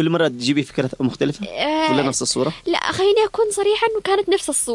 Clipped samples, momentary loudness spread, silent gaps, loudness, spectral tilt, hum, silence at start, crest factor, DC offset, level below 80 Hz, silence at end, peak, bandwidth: under 0.1%; 5 LU; none; -19 LUFS; -4 dB/octave; none; 0 s; 14 dB; under 0.1%; -52 dBFS; 0 s; -6 dBFS; 11.5 kHz